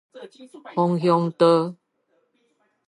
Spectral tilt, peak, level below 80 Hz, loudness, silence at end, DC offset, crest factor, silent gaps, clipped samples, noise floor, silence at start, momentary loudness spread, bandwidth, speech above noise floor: -8 dB/octave; -6 dBFS; -76 dBFS; -21 LUFS; 1.15 s; under 0.1%; 18 dB; none; under 0.1%; -69 dBFS; 0.15 s; 20 LU; 10.5 kHz; 48 dB